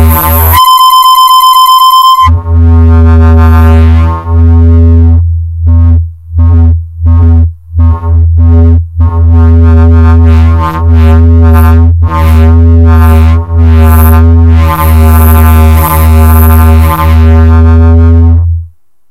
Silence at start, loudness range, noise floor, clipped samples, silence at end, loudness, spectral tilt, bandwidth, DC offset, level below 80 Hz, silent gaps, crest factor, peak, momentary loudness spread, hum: 0 s; 4 LU; -26 dBFS; 6%; 0.45 s; -4 LUFS; -6.5 dB/octave; 16.5 kHz; under 0.1%; -6 dBFS; none; 2 dB; 0 dBFS; 6 LU; none